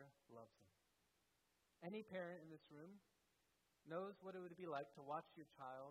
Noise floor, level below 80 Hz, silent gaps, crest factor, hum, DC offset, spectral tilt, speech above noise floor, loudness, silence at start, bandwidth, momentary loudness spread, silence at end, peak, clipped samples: -85 dBFS; under -90 dBFS; none; 20 dB; none; under 0.1%; -7 dB/octave; 31 dB; -55 LUFS; 0 s; 12 kHz; 14 LU; 0 s; -36 dBFS; under 0.1%